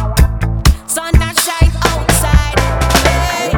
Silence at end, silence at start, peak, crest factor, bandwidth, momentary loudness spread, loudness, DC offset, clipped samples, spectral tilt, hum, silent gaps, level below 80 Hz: 0 s; 0 s; 0 dBFS; 12 dB; over 20 kHz; 3 LU; -13 LUFS; under 0.1%; under 0.1%; -4 dB/octave; none; none; -14 dBFS